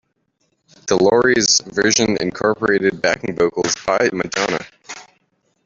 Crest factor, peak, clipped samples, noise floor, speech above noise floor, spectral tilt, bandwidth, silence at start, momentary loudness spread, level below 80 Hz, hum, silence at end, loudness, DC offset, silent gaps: 18 dB; -2 dBFS; under 0.1%; -67 dBFS; 50 dB; -3 dB/octave; 7.8 kHz; 0.85 s; 16 LU; -52 dBFS; none; 0.65 s; -17 LUFS; under 0.1%; none